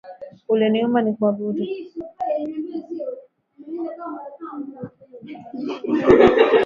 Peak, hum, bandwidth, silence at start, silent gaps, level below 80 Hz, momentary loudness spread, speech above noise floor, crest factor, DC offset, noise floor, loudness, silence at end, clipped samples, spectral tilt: 0 dBFS; none; 7.2 kHz; 0.05 s; none; -50 dBFS; 24 LU; 26 dB; 20 dB; under 0.1%; -46 dBFS; -20 LUFS; 0 s; under 0.1%; -7.5 dB/octave